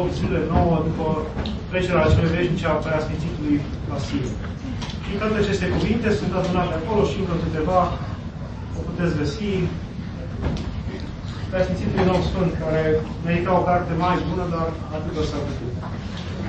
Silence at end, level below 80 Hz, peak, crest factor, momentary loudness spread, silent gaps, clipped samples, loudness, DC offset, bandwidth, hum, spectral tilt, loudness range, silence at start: 0 s; -34 dBFS; -4 dBFS; 18 dB; 11 LU; none; under 0.1%; -23 LUFS; under 0.1%; 8.6 kHz; none; -7 dB/octave; 4 LU; 0 s